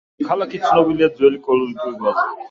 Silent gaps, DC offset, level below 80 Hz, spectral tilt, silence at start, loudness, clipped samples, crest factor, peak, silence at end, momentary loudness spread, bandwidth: none; under 0.1%; -56 dBFS; -6.5 dB/octave; 0.2 s; -18 LUFS; under 0.1%; 16 dB; -2 dBFS; 0.05 s; 7 LU; 7.4 kHz